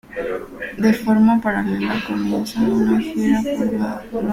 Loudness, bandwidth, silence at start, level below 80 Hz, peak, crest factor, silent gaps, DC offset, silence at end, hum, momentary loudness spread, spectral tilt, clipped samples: -19 LUFS; 15.5 kHz; 0.1 s; -46 dBFS; -4 dBFS; 16 dB; none; under 0.1%; 0 s; none; 11 LU; -6.5 dB/octave; under 0.1%